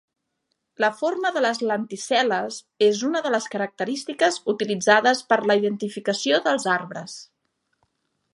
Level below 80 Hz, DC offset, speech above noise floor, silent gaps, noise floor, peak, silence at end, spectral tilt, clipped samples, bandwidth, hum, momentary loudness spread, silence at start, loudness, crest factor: -78 dBFS; under 0.1%; 54 dB; none; -76 dBFS; -2 dBFS; 1.1 s; -3.5 dB/octave; under 0.1%; 11.5 kHz; none; 9 LU; 0.8 s; -22 LUFS; 22 dB